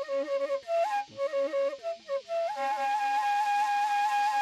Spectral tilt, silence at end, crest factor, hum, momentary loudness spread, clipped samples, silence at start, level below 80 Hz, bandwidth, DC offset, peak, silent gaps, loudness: -1.5 dB/octave; 0 s; 10 dB; none; 6 LU; under 0.1%; 0 s; -82 dBFS; 14 kHz; under 0.1%; -20 dBFS; none; -29 LUFS